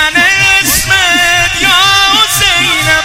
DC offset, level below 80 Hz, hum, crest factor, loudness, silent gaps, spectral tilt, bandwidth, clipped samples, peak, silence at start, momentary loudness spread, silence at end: under 0.1%; -30 dBFS; none; 8 dB; -6 LUFS; none; -1 dB/octave; over 20 kHz; 0.7%; 0 dBFS; 0 s; 2 LU; 0 s